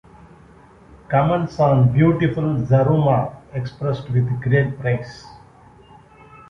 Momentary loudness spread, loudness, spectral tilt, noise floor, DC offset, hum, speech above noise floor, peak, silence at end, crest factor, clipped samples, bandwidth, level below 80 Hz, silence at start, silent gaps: 12 LU; -19 LUFS; -9.5 dB/octave; -47 dBFS; under 0.1%; none; 29 dB; -4 dBFS; 1.1 s; 16 dB; under 0.1%; 6.4 kHz; -46 dBFS; 1.1 s; none